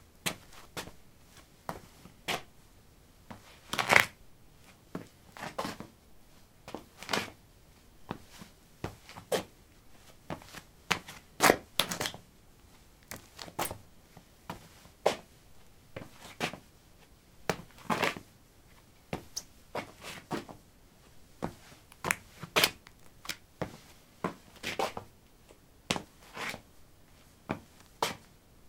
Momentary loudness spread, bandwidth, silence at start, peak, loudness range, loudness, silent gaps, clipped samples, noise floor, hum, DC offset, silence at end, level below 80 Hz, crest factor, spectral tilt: 23 LU; 17.5 kHz; 0.25 s; -2 dBFS; 10 LU; -34 LUFS; none; under 0.1%; -59 dBFS; none; under 0.1%; 0 s; -62 dBFS; 36 dB; -2.5 dB/octave